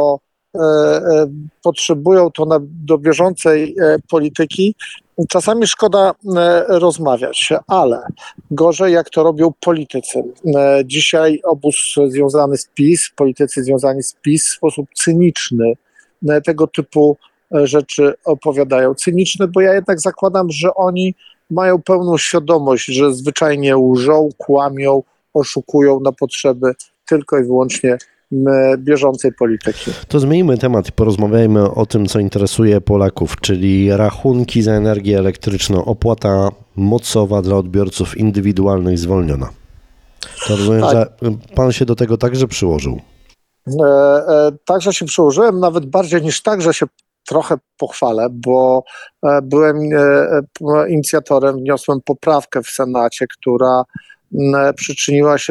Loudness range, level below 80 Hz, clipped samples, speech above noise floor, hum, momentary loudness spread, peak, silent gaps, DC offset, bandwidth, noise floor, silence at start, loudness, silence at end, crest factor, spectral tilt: 2 LU; -40 dBFS; under 0.1%; 38 dB; none; 7 LU; 0 dBFS; none; under 0.1%; 13 kHz; -51 dBFS; 0 s; -14 LUFS; 0 s; 12 dB; -5.5 dB/octave